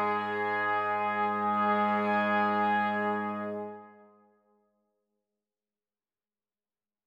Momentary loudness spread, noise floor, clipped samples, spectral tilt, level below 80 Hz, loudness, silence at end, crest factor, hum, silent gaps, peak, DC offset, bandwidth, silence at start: 10 LU; under -90 dBFS; under 0.1%; -7.5 dB/octave; -88 dBFS; -29 LUFS; 3.15 s; 14 dB; none; none; -18 dBFS; under 0.1%; 7 kHz; 0 s